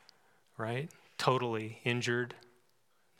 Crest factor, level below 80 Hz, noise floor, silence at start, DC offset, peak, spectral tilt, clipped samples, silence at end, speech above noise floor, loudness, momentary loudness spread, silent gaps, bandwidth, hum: 24 dB; -84 dBFS; -75 dBFS; 0.6 s; under 0.1%; -12 dBFS; -5 dB/octave; under 0.1%; 0.8 s; 40 dB; -35 LUFS; 13 LU; none; 16.5 kHz; none